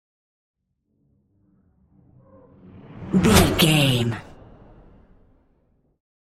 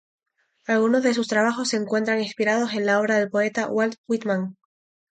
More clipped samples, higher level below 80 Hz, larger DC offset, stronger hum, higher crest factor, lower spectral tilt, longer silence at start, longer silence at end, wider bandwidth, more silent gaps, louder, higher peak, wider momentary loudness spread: neither; first, -40 dBFS vs -72 dBFS; neither; neither; first, 24 dB vs 16 dB; about the same, -4.5 dB/octave vs -4.5 dB/octave; first, 2.95 s vs 0.7 s; first, 2.05 s vs 0.6 s; first, 16 kHz vs 9.2 kHz; second, none vs 3.98-4.04 s; first, -18 LUFS vs -22 LUFS; first, 0 dBFS vs -8 dBFS; first, 16 LU vs 6 LU